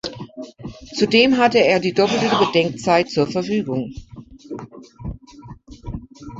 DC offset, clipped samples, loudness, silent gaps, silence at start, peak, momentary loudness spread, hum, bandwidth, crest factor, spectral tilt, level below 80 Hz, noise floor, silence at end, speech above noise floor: under 0.1%; under 0.1%; -17 LUFS; none; 0.05 s; -2 dBFS; 21 LU; none; 8 kHz; 18 dB; -5 dB/octave; -44 dBFS; -41 dBFS; 0 s; 24 dB